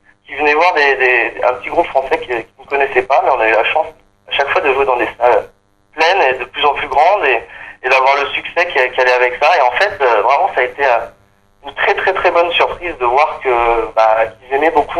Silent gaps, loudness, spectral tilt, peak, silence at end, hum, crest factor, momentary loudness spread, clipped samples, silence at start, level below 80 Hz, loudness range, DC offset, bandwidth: none; -13 LUFS; -3.5 dB/octave; 0 dBFS; 0 s; none; 14 dB; 7 LU; under 0.1%; 0.3 s; -44 dBFS; 2 LU; under 0.1%; 12 kHz